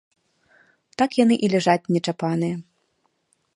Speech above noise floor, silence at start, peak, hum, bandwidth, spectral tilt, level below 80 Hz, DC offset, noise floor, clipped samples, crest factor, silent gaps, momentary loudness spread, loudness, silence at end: 49 dB; 1 s; -4 dBFS; none; 11 kHz; -6 dB/octave; -68 dBFS; under 0.1%; -70 dBFS; under 0.1%; 20 dB; none; 10 LU; -21 LUFS; 0.95 s